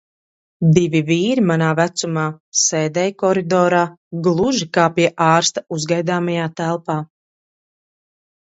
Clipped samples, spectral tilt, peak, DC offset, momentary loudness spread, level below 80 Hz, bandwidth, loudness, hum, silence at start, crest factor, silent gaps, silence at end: under 0.1%; -4.5 dB/octave; 0 dBFS; under 0.1%; 8 LU; -58 dBFS; 8 kHz; -17 LUFS; none; 0.6 s; 18 dB; 2.40-2.52 s, 3.97-4.11 s; 1.4 s